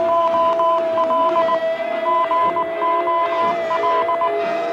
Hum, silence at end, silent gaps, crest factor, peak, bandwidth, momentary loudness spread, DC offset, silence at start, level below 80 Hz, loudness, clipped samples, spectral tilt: none; 0 s; none; 10 dB; -8 dBFS; 7.8 kHz; 4 LU; under 0.1%; 0 s; -64 dBFS; -18 LUFS; under 0.1%; -5 dB/octave